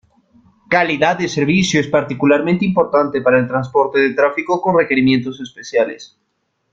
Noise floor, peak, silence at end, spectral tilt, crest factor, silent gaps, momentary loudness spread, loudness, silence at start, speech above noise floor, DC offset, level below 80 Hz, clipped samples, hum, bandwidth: -52 dBFS; 0 dBFS; 0.65 s; -5.5 dB/octave; 16 dB; none; 5 LU; -15 LUFS; 0.7 s; 37 dB; under 0.1%; -52 dBFS; under 0.1%; none; 7.8 kHz